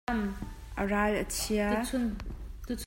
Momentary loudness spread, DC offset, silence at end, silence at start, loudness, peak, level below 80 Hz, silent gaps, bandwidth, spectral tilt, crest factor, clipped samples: 13 LU; under 0.1%; 0 s; 0.1 s; -31 LUFS; -14 dBFS; -42 dBFS; none; 16.5 kHz; -4.5 dB/octave; 18 dB; under 0.1%